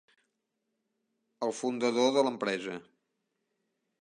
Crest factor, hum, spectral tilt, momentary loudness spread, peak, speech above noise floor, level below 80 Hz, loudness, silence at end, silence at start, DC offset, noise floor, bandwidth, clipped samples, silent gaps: 20 dB; none; -4 dB/octave; 12 LU; -14 dBFS; 53 dB; -86 dBFS; -30 LUFS; 1.2 s; 1.4 s; under 0.1%; -83 dBFS; 10.5 kHz; under 0.1%; none